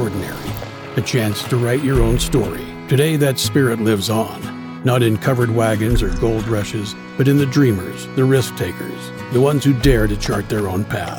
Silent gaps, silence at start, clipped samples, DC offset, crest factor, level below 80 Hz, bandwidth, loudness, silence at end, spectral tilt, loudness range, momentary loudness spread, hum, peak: none; 0 s; under 0.1%; under 0.1%; 16 dB; -28 dBFS; 19.5 kHz; -18 LUFS; 0 s; -6 dB/octave; 1 LU; 11 LU; none; 0 dBFS